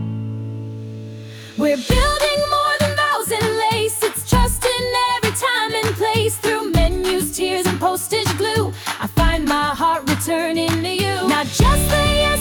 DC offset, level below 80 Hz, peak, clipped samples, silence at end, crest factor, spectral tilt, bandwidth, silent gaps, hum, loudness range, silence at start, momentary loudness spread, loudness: under 0.1%; -28 dBFS; -4 dBFS; under 0.1%; 0 s; 14 dB; -4 dB/octave; over 20 kHz; none; none; 2 LU; 0 s; 10 LU; -18 LUFS